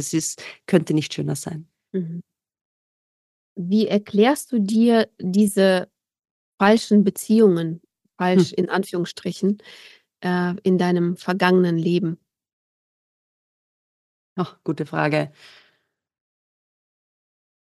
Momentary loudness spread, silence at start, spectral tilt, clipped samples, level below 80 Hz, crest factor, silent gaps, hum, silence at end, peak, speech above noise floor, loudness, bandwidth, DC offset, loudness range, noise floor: 14 LU; 0 s; -6 dB/octave; under 0.1%; -70 dBFS; 20 dB; 2.61-3.56 s, 6.31-6.58 s, 12.53-14.36 s; none; 2.5 s; -2 dBFS; 49 dB; -21 LUFS; 12.5 kHz; under 0.1%; 10 LU; -69 dBFS